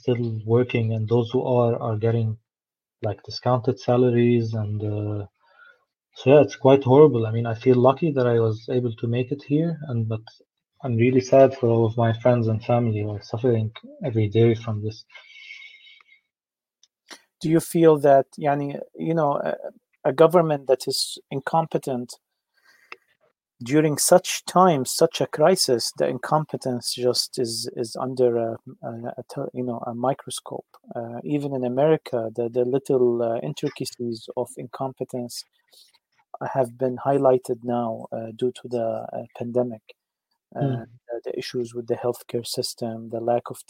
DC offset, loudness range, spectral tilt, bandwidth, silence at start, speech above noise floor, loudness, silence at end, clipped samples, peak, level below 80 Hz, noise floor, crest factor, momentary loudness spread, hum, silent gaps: under 0.1%; 9 LU; -6 dB/octave; 16.5 kHz; 0.05 s; over 68 dB; -22 LUFS; 0.1 s; under 0.1%; -2 dBFS; -66 dBFS; under -90 dBFS; 22 dB; 15 LU; none; none